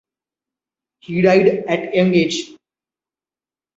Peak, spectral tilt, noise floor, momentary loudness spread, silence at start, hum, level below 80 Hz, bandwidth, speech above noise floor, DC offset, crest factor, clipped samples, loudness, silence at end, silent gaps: -2 dBFS; -6 dB/octave; under -90 dBFS; 12 LU; 1.1 s; none; -58 dBFS; 8 kHz; over 75 dB; under 0.1%; 18 dB; under 0.1%; -16 LUFS; 1.25 s; none